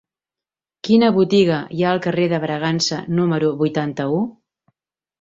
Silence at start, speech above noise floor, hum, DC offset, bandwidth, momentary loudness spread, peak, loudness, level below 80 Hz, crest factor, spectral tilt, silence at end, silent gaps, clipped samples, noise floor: 0.85 s; 72 dB; none; under 0.1%; 7.8 kHz; 7 LU; -2 dBFS; -18 LUFS; -60 dBFS; 16 dB; -6 dB/octave; 0.9 s; none; under 0.1%; -89 dBFS